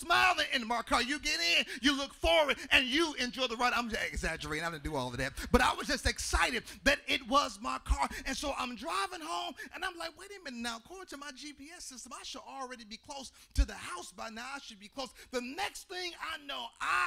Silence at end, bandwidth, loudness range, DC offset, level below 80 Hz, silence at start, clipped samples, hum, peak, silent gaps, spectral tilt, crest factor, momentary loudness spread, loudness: 0 s; 16 kHz; 13 LU; under 0.1%; -44 dBFS; 0 s; under 0.1%; none; -10 dBFS; none; -3 dB/octave; 24 dB; 17 LU; -32 LUFS